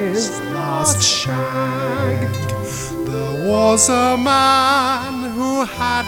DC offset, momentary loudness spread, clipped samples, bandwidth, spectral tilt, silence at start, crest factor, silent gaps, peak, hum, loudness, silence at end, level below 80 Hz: under 0.1%; 11 LU; under 0.1%; 19 kHz; -3.5 dB/octave; 0 s; 18 dB; none; 0 dBFS; none; -17 LUFS; 0 s; -44 dBFS